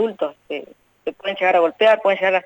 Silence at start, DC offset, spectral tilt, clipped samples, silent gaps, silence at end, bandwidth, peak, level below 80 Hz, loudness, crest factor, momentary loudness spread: 0 s; under 0.1%; -5 dB/octave; under 0.1%; none; 0.05 s; 19 kHz; -4 dBFS; -70 dBFS; -18 LUFS; 14 dB; 16 LU